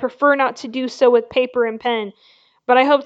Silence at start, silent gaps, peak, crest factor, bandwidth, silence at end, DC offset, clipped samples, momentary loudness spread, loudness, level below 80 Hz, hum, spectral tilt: 0 s; none; -2 dBFS; 16 dB; 7.8 kHz; 0 s; under 0.1%; under 0.1%; 11 LU; -18 LUFS; -66 dBFS; none; -4 dB/octave